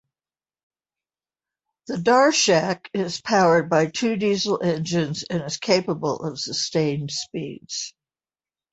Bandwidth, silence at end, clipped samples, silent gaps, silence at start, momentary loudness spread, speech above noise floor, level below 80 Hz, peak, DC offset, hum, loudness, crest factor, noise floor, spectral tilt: 8.2 kHz; 0.85 s; under 0.1%; none; 1.9 s; 13 LU; over 68 dB; -62 dBFS; -4 dBFS; under 0.1%; none; -22 LUFS; 18 dB; under -90 dBFS; -4 dB/octave